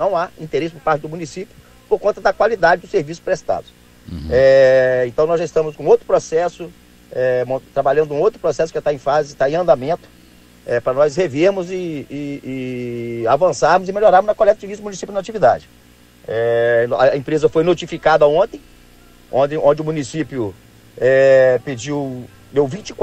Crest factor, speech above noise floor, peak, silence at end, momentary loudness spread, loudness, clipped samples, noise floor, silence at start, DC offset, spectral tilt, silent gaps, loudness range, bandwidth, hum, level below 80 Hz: 16 dB; 30 dB; 0 dBFS; 0 s; 14 LU; -17 LUFS; under 0.1%; -46 dBFS; 0 s; under 0.1%; -5.5 dB/octave; none; 4 LU; 9 kHz; 60 Hz at -50 dBFS; -46 dBFS